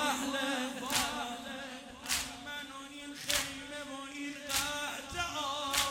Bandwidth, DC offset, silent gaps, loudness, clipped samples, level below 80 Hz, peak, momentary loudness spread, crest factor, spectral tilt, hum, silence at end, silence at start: 17.5 kHz; under 0.1%; none; -36 LUFS; under 0.1%; -60 dBFS; -12 dBFS; 11 LU; 24 dB; -1 dB/octave; none; 0 s; 0 s